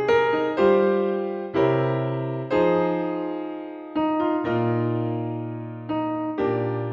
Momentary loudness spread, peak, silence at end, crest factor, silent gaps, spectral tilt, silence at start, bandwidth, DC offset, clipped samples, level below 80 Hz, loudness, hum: 10 LU; -8 dBFS; 0 s; 16 dB; none; -9 dB/octave; 0 s; 7 kHz; under 0.1%; under 0.1%; -58 dBFS; -24 LUFS; none